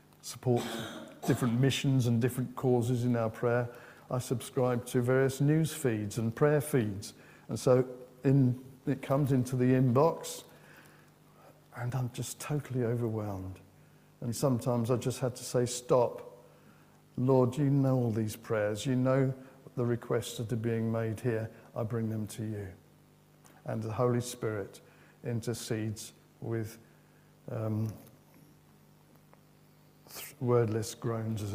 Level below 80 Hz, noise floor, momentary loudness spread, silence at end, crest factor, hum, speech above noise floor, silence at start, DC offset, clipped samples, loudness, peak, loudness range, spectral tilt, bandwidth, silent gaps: -66 dBFS; -61 dBFS; 15 LU; 0 s; 20 dB; 50 Hz at -60 dBFS; 31 dB; 0.25 s; under 0.1%; under 0.1%; -31 LUFS; -12 dBFS; 8 LU; -6.5 dB/octave; 16 kHz; none